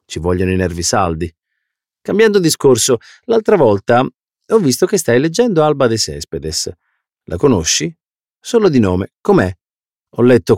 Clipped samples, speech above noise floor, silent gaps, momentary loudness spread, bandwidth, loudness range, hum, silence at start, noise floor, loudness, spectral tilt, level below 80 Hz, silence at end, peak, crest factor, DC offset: under 0.1%; over 77 dB; none; 11 LU; 16.5 kHz; 3 LU; none; 0.1 s; under -90 dBFS; -14 LUFS; -4.5 dB/octave; -40 dBFS; 0 s; -2 dBFS; 14 dB; under 0.1%